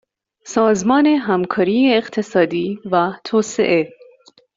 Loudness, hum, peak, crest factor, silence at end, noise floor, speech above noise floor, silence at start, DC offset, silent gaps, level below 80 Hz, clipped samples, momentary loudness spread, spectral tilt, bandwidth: -17 LUFS; none; -2 dBFS; 14 dB; 0.7 s; -50 dBFS; 34 dB; 0.45 s; under 0.1%; none; -60 dBFS; under 0.1%; 6 LU; -5 dB/octave; 7.8 kHz